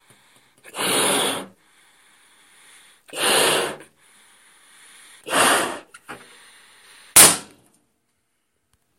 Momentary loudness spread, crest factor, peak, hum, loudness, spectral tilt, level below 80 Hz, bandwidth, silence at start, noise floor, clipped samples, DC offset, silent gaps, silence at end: 30 LU; 24 dB; 0 dBFS; none; -17 LUFS; -0.5 dB/octave; -62 dBFS; 16 kHz; 0.75 s; -73 dBFS; under 0.1%; under 0.1%; none; 1.55 s